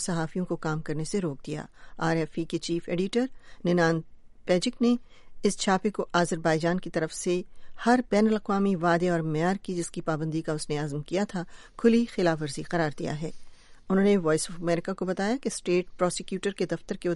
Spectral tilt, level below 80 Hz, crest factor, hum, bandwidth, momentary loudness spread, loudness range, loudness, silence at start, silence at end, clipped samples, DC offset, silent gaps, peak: -5.5 dB/octave; -52 dBFS; 18 dB; none; 11.5 kHz; 9 LU; 3 LU; -28 LUFS; 0 s; 0 s; under 0.1%; under 0.1%; none; -8 dBFS